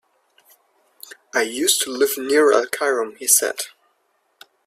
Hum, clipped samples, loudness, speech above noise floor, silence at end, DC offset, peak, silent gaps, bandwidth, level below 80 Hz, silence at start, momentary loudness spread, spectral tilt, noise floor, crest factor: none; under 0.1%; -18 LUFS; 48 dB; 1 s; under 0.1%; 0 dBFS; none; 16 kHz; -70 dBFS; 1.35 s; 9 LU; 0.5 dB/octave; -67 dBFS; 22 dB